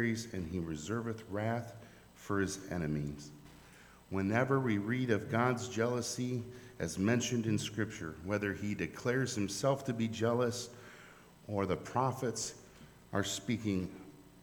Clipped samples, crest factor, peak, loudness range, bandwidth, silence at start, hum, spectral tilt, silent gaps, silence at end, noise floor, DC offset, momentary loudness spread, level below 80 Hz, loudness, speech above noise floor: under 0.1%; 20 dB; -16 dBFS; 4 LU; over 20 kHz; 0 s; none; -5 dB/octave; none; 0 s; -58 dBFS; under 0.1%; 16 LU; -62 dBFS; -36 LUFS; 23 dB